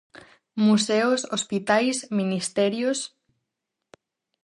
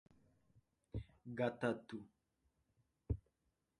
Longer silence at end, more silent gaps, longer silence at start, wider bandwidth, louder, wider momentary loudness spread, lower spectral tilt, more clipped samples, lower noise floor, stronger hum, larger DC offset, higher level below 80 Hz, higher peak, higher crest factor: first, 1.4 s vs 0.6 s; neither; second, 0.15 s vs 0.95 s; first, 11.5 kHz vs 10 kHz; first, -23 LUFS vs -45 LUFS; second, 7 LU vs 13 LU; second, -4 dB/octave vs -7.5 dB/octave; neither; about the same, -83 dBFS vs -86 dBFS; neither; neither; second, -70 dBFS vs -58 dBFS; first, -6 dBFS vs -24 dBFS; second, 18 dB vs 24 dB